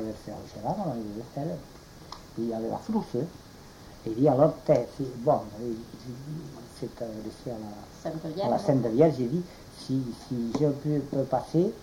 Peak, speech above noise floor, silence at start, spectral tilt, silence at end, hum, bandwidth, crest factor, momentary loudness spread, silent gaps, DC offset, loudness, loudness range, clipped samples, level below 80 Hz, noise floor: -8 dBFS; 19 dB; 0 s; -8 dB/octave; 0 s; none; 16.5 kHz; 20 dB; 19 LU; none; under 0.1%; -29 LUFS; 7 LU; under 0.1%; -56 dBFS; -48 dBFS